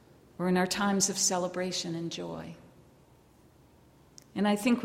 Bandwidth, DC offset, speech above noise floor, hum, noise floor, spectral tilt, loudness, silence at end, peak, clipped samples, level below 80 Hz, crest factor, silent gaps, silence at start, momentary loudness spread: 16.5 kHz; under 0.1%; 30 dB; none; -60 dBFS; -3.5 dB/octave; -30 LUFS; 0 s; -12 dBFS; under 0.1%; -66 dBFS; 20 dB; none; 0.4 s; 14 LU